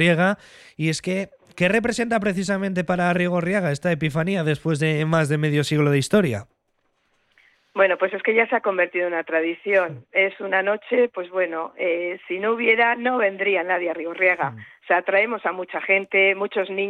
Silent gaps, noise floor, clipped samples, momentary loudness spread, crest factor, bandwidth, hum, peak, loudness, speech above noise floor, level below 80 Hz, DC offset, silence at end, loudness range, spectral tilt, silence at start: none; -70 dBFS; under 0.1%; 7 LU; 16 dB; 13 kHz; none; -6 dBFS; -21 LUFS; 48 dB; -58 dBFS; under 0.1%; 0 s; 2 LU; -6 dB/octave; 0 s